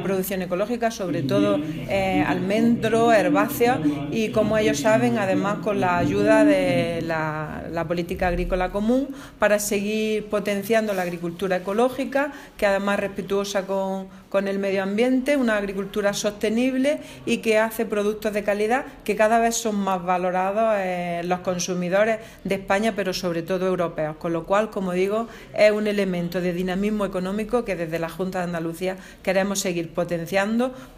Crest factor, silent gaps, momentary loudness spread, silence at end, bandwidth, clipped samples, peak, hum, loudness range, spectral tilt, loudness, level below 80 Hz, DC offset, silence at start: 18 dB; none; 7 LU; 0 s; 16 kHz; under 0.1%; -6 dBFS; none; 4 LU; -5 dB/octave; -23 LUFS; -46 dBFS; under 0.1%; 0 s